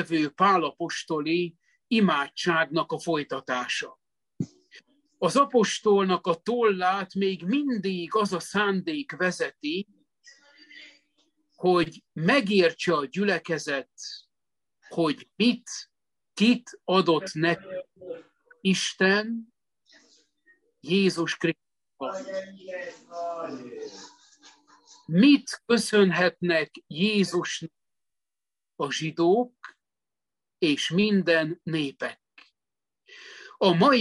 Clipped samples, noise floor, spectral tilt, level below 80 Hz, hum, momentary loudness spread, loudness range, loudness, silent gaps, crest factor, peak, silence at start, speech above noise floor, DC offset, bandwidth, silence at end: under 0.1%; under -90 dBFS; -5 dB/octave; -72 dBFS; none; 16 LU; 6 LU; -25 LUFS; none; 20 dB; -8 dBFS; 0 s; over 65 dB; under 0.1%; 12 kHz; 0 s